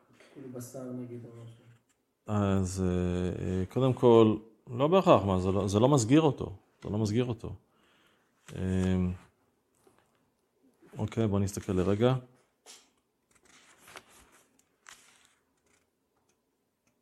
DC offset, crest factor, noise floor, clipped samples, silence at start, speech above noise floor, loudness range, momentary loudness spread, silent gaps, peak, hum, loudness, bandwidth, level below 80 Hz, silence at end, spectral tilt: under 0.1%; 24 dB; -78 dBFS; under 0.1%; 0.35 s; 50 dB; 11 LU; 22 LU; none; -6 dBFS; none; -28 LUFS; 13.5 kHz; -64 dBFS; 3.05 s; -7 dB/octave